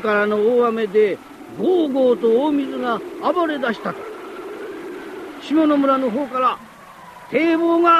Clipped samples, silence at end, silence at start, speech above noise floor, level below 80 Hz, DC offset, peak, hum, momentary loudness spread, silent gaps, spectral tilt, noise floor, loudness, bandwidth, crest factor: under 0.1%; 0 s; 0 s; 24 dB; -62 dBFS; under 0.1%; -2 dBFS; none; 16 LU; none; -6 dB/octave; -41 dBFS; -19 LUFS; 13.5 kHz; 16 dB